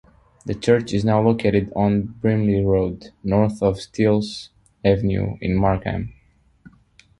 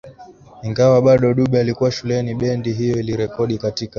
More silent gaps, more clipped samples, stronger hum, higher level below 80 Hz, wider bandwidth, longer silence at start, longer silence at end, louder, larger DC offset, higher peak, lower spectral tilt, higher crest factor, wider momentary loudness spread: neither; neither; neither; first, -40 dBFS vs -46 dBFS; first, 11.5 kHz vs 7.2 kHz; first, 0.45 s vs 0.05 s; first, 1.1 s vs 0.1 s; second, -21 LUFS vs -18 LUFS; neither; about the same, -2 dBFS vs -2 dBFS; about the same, -7.5 dB/octave vs -7 dB/octave; about the same, 18 dB vs 16 dB; first, 12 LU vs 9 LU